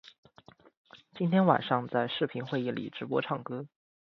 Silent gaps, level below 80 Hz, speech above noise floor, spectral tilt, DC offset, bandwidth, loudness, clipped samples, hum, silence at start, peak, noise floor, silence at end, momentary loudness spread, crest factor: 0.18-0.23 s, 0.77-0.85 s; -74 dBFS; 29 dB; -8.5 dB/octave; under 0.1%; 6 kHz; -30 LUFS; under 0.1%; none; 0.05 s; -8 dBFS; -58 dBFS; 0.5 s; 13 LU; 24 dB